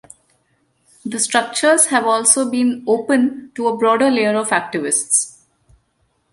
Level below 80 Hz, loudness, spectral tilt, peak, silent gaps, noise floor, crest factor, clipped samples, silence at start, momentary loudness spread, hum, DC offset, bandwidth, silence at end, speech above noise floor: -64 dBFS; -16 LUFS; -2 dB/octave; 0 dBFS; none; -65 dBFS; 18 dB; under 0.1%; 1.05 s; 8 LU; none; under 0.1%; 11.5 kHz; 1.05 s; 48 dB